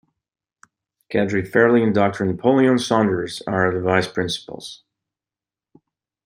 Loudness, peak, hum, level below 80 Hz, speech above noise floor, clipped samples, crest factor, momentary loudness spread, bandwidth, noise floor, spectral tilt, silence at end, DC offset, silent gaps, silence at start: -19 LUFS; -2 dBFS; none; -60 dBFS; over 71 dB; under 0.1%; 18 dB; 10 LU; 15.5 kHz; under -90 dBFS; -6 dB/octave; 1.5 s; under 0.1%; none; 1.1 s